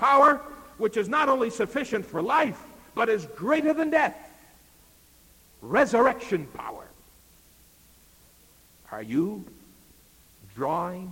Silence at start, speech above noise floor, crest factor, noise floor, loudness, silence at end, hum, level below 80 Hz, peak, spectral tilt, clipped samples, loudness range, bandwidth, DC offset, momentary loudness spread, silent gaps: 0 s; 32 dB; 18 dB; -57 dBFS; -25 LUFS; 0 s; none; -60 dBFS; -8 dBFS; -5.5 dB/octave; under 0.1%; 11 LU; 17 kHz; under 0.1%; 19 LU; none